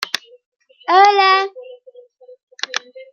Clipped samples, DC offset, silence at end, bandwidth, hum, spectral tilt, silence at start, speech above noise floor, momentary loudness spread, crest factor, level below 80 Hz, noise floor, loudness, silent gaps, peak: under 0.1%; under 0.1%; 0.1 s; 13.5 kHz; none; 0 dB/octave; 0 s; 31 dB; 17 LU; 16 dB; -80 dBFS; -45 dBFS; -15 LUFS; 0.46-0.52 s, 2.43-2.47 s; -2 dBFS